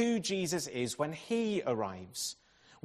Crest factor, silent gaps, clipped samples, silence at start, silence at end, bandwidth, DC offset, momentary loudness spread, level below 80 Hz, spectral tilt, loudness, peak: 16 dB; none; under 0.1%; 0 s; 0.5 s; 14 kHz; under 0.1%; 7 LU; -72 dBFS; -4 dB/octave; -35 LUFS; -18 dBFS